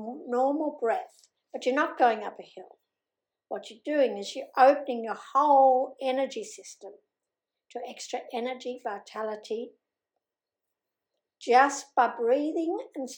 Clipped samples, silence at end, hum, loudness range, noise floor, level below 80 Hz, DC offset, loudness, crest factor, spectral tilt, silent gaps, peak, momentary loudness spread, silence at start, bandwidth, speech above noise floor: under 0.1%; 0 s; none; 12 LU; -89 dBFS; under -90 dBFS; under 0.1%; -27 LUFS; 20 dB; -3 dB/octave; none; -8 dBFS; 19 LU; 0 s; 17.5 kHz; 62 dB